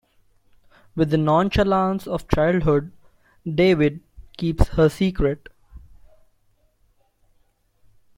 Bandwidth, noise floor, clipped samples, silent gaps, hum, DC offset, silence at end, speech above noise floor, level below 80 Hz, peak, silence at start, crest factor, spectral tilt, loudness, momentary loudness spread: 16.5 kHz; -63 dBFS; under 0.1%; none; none; under 0.1%; 2.4 s; 43 dB; -34 dBFS; 0 dBFS; 0.95 s; 22 dB; -7.5 dB/octave; -21 LUFS; 14 LU